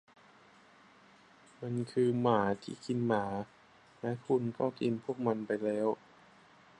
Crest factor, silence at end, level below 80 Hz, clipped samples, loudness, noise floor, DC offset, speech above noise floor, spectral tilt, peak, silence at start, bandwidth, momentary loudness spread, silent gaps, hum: 20 dB; 0.85 s; -72 dBFS; under 0.1%; -34 LUFS; -61 dBFS; under 0.1%; 28 dB; -7.5 dB/octave; -14 dBFS; 1.6 s; 10.5 kHz; 11 LU; none; none